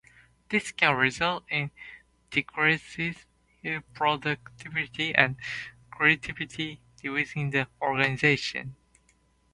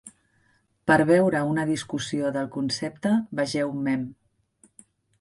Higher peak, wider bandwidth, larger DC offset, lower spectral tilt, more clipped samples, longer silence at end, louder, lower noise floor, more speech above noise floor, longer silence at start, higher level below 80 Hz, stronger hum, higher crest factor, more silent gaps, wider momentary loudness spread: first, 0 dBFS vs -6 dBFS; about the same, 11.5 kHz vs 11.5 kHz; neither; about the same, -4.5 dB/octave vs -5.5 dB/octave; neither; second, 0.8 s vs 1.05 s; about the same, -27 LUFS vs -25 LUFS; about the same, -66 dBFS vs -66 dBFS; second, 38 dB vs 42 dB; first, 0.5 s vs 0.05 s; about the same, -60 dBFS vs -62 dBFS; neither; first, 28 dB vs 20 dB; neither; first, 14 LU vs 9 LU